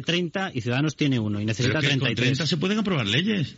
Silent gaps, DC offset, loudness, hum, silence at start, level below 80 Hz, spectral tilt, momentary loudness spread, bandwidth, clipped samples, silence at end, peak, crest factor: none; under 0.1%; -24 LUFS; none; 0 s; -58 dBFS; -4.5 dB/octave; 4 LU; 8 kHz; under 0.1%; 0.05 s; -10 dBFS; 14 dB